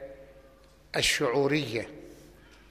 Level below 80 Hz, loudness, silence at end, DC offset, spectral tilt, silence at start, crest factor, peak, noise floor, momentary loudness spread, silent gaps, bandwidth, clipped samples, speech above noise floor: -54 dBFS; -27 LUFS; 0.4 s; under 0.1%; -3.5 dB/octave; 0 s; 18 dB; -14 dBFS; -56 dBFS; 20 LU; none; 15 kHz; under 0.1%; 29 dB